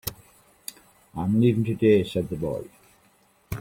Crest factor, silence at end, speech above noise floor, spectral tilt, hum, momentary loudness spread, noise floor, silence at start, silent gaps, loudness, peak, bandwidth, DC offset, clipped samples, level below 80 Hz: 18 dB; 0 s; 39 dB; -7 dB/octave; none; 20 LU; -61 dBFS; 0.05 s; none; -24 LUFS; -8 dBFS; 16.5 kHz; under 0.1%; under 0.1%; -52 dBFS